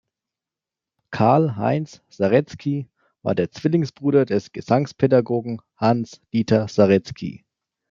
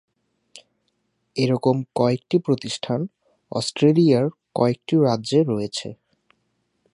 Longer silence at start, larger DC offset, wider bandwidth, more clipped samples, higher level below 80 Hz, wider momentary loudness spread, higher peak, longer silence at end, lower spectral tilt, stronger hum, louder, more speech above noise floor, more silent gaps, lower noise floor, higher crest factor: second, 1.1 s vs 1.35 s; neither; second, 7.6 kHz vs 11 kHz; neither; about the same, -60 dBFS vs -64 dBFS; about the same, 14 LU vs 12 LU; about the same, -2 dBFS vs -4 dBFS; second, 0.55 s vs 1 s; first, -8 dB/octave vs -6.5 dB/octave; neither; about the same, -21 LUFS vs -21 LUFS; first, 68 dB vs 51 dB; neither; first, -88 dBFS vs -71 dBFS; about the same, 20 dB vs 18 dB